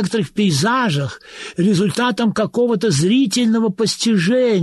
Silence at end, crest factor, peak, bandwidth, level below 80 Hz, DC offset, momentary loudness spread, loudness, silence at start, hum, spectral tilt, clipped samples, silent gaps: 0 s; 10 dB; -6 dBFS; 12.5 kHz; -56 dBFS; under 0.1%; 5 LU; -17 LUFS; 0 s; none; -5 dB/octave; under 0.1%; none